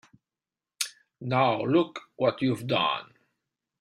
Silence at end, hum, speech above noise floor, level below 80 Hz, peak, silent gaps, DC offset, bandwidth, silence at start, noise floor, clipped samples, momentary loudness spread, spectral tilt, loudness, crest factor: 0.75 s; none; over 64 dB; -68 dBFS; -8 dBFS; none; under 0.1%; 16 kHz; 0.8 s; under -90 dBFS; under 0.1%; 9 LU; -5 dB/octave; -27 LUFS; 22 dB